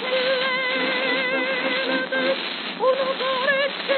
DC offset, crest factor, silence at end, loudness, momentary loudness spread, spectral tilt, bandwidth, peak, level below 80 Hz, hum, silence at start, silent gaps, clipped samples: under 0.1%; 16 dB; 0 s; -22 LUFS; 2 LU; -6 dB/octave; 4.6 kHz; -8 dBFS; under -90 dBFS; none; 0 s; none; under 0.1%